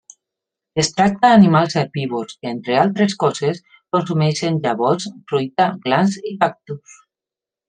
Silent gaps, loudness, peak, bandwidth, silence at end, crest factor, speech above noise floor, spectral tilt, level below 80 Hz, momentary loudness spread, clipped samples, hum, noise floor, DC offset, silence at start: none; -18 LUFS; -2 dBFS; 9.4 kHz; 0.9 s; 18 dB; 71 dB; -5.5 dB/octave; -58 dBFS; 14 LU; under 0.1%; none; -89 dBFS; under 0.1%; 0.75 s